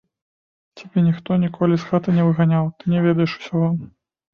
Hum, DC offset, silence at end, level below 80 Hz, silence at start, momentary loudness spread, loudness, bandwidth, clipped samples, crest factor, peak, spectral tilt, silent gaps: none; under 0.1%; 0.5 s; -58 dBFS; 0.75 s; 5 LU; -20 LUFS; 6.4 kHz; under 0.1%; 16 dB; -4 dBFS; -9 dB/octave; none